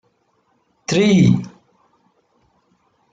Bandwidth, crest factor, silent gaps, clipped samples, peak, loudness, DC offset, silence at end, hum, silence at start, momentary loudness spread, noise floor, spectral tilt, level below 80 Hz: 7.8 kHz; 18 dB; none; under 0.1%; -2 dBFS; -15 LUFS; under 0.1%; 1.65 s; none; 0.9 s; 20 LU; -64 dBFS; -6.5 dB/octave; -52 dBFS